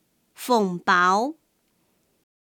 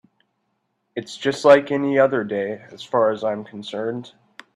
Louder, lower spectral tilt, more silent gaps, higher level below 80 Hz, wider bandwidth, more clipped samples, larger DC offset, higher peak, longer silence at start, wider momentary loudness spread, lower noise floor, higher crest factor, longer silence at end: about the same, -21 LUFS vs -20 LUFS; about the same, -4.5 dB/octave vs -5.5 dB/octave; neither; second, -78 dBFS vs -70 dBFS; first, 19 kHz vs 10.5 kHz; neither; neither; second, -8 dBFS vs 0 dBFS; second, 0.4 s vs 0.95 s; second, 12 LU vs 18 LU; about the same, -69 dBFS vs -72 dBFS; about the same, 18 dB vs 22 dB; first, 1.15 s vs 0.45 s